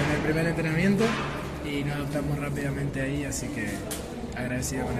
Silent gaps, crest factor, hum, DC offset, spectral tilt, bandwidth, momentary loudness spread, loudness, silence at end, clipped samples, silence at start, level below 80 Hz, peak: none; 16 dB; none; under 0.1%; -5.5 dB/octave; 14.5 kHz; 9 LU; -28 LUFS; 0 s; under 0.1%; 0 s; -42 dBFS; -12 dBFS